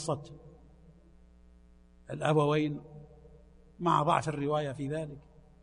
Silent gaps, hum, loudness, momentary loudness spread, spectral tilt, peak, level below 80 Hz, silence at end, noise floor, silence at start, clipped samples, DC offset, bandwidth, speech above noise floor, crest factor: none; 60 Hz at -60 dBFS; -31 LUFS; 25 LU; -6.5 dB/octave; -12 dBFS; -60 dBFS; 0.45 s; -58 dBFS; 0 s; under 0.1%; under 0.1%; 10.5 kHz; 28 dB; 22 dB